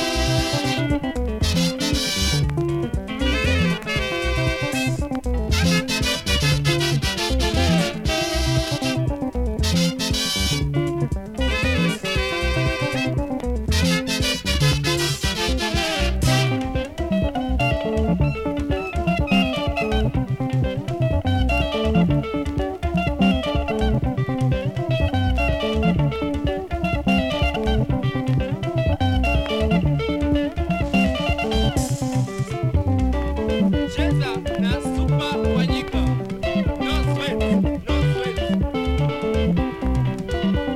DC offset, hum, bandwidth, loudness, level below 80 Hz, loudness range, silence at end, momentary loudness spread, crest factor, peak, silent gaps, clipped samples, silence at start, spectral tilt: under 0.1%; none; 16 kHz; -21 LUFS; -28 dBFS; 2 LU; 0 s; 5 LU; 14 dB; -6 dBFS; none; under 0.1%; 0 s; -5.5 dB/octave